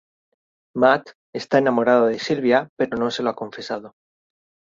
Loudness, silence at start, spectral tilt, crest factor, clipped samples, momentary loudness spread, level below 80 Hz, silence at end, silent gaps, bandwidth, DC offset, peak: -20 LUFS; 0.75 s; -5.5 dB/octave; 20 dB; under 0.1%; 14 LU; -62 dBFS; 0.8 s; 1.15-1.33 s, 2.69-2.77 s; 7.8 kHz; under 0.1%; 0 dBFS